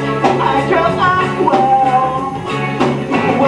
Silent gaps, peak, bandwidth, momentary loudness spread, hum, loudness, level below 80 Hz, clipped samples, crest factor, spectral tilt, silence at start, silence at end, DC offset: none; 0 dBFS; 11 kHz; 7 LU; none; -14 LUFS; -42 dBFS; under 0.1%; 14 dB; -6.5 dB/octave; 0 s; 0 s; under 0.1%